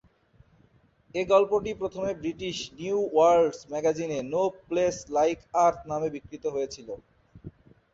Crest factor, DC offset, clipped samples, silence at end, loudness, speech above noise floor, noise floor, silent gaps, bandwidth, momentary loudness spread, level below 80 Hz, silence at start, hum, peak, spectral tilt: 20 dB; under 0.1%; under 0.1%; 0.45 s; -27 LUFS; 36 dB; -62 dBFS; none; 7.8 kHz; 12 LU; -58 dBFS; 1.15 s; none; -8 dBFS; -5 dB/octave